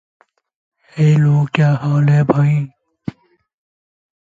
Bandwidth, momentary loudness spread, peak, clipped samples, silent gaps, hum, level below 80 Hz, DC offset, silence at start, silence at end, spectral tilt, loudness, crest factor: 7.6 kHz; 18 LU; 0 dBFS; under 0.1%; none; none; -54 dBFS; under 0.1%; 0.95 s; 1.55 s; -8.5 dB/octave; -14 LUFS; 16 dB